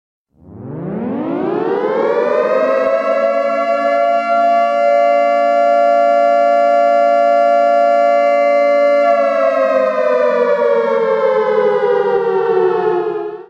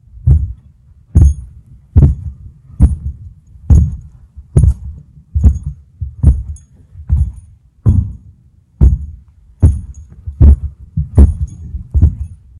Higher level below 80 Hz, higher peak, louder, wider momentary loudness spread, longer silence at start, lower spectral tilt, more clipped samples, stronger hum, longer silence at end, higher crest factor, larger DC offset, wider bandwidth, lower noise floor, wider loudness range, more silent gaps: second, -64 dBFS vs -16 dBFS; about the same, -2 dBFS vs 0 dBFS; about the same, -13 LUFS vs -14 LUFS; second, 5 LU vs 19 LU; first, 0.5 s vs 0.25 s; second, -6 dB/octave vs -10.5 dB/octave; second, under 0.1% vs 1%; neither; second, 0.05 s vs 0.25 s; about the same, 10 dB vs 14 dB; neither; second, 8 kHz vs 10.5 kHz; second, -34 dBFS vs -46 dBFS; about the same, 4 LU vs 4 LU; neither